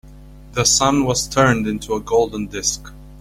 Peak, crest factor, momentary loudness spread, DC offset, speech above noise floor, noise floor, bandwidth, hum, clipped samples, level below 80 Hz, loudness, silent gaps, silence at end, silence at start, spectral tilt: -2 dBFS; 18 dB; 9 LU; under 0.1%; 22 dB; -40 dBFS; 16.5 kHz; none; under 0.1%; -40 dBFS; -18 LUFS; none; 0 s; 0.05 s; -3.5 dB/octave